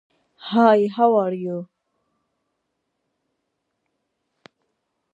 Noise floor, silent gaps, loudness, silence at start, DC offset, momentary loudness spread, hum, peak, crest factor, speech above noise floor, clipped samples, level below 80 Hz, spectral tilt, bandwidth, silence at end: -76 dBFS; none; -19 LUFS; 0.45 s; under 0.1%; 16 LU; none; -2 dBFS; 22 dB; 58 dB; under 0.1%; -80 dBFS; -8 dB/octave; 7.4 kHz; 3.5 s